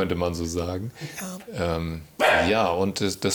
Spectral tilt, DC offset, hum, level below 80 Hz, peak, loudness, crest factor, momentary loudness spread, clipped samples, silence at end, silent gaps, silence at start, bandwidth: -4.5 dB/octave; under 0.1%; none; -50 dBFS; -6 dBFS; -25 LUFS; 18 dB; 14 LU; under 0.1%; 0 s; none; 0 s; over 20 kHz